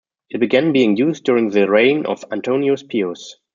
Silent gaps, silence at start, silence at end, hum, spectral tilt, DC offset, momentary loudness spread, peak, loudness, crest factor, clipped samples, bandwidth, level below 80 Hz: none; 0.35 s; 0.2 s; none; -6 dB/octave; under 0.1%; 10 LU; -2 dBFS; -17 LUFS; 16 dB; under 0.1%; 7.4 kHz; -64 dBFS